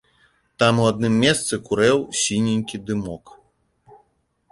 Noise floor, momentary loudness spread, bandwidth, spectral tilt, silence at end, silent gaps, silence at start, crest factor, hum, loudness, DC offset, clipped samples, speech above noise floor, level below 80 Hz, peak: -65 dBFS; 10 LU; 11.5 kHz; -4.5 dB/octave; 1.35 s; none; 0.6 s; 18 dB; none; -20 LUFS; under 0.1%; under 0.1%; 45 dB; -52 dBFS; -4 dBFS